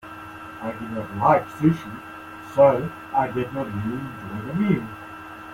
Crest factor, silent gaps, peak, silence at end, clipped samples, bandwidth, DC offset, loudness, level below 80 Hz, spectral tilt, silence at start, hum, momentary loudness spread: 20 dB; none; -4 dBFS; 0 s; under 0.1%; 16.5 kHz; under 0.1%; -23 LUFS; -54 dBFS; -8.5 dB/octave; 0.05 s; none; 20 LU